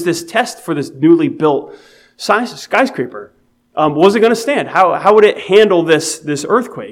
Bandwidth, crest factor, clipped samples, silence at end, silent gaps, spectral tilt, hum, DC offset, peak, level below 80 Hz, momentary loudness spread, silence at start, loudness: 15.5 kHz; 14 dB; 0.2%; 0 s; none; -4.5 dB/octave; none; under 0.1%; 0 dBFS; -62 dBFS; 11 LU; 0 s; -13 LUFS